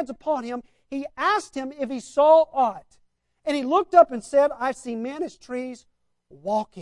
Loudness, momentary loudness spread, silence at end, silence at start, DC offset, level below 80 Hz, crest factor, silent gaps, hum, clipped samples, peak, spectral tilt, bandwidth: -23 LUFS; 17 LU; 0 s; 0 s; under 0.1%; -64 dBFS; 20 dB; none; none; under 0.1%; -2 dBFS; -4.5 dB/octave; 11 kHz